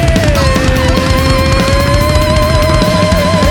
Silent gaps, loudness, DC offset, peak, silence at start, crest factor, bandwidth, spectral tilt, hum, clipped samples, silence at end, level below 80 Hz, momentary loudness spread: none; -10 LUFS; under 0.1%; 0 dBFS; 0 s; 8 dB; 19.5 kHz; -5.5 dB/octave; none; under 0.1%; 0 s; -16 dBFS; 1 LU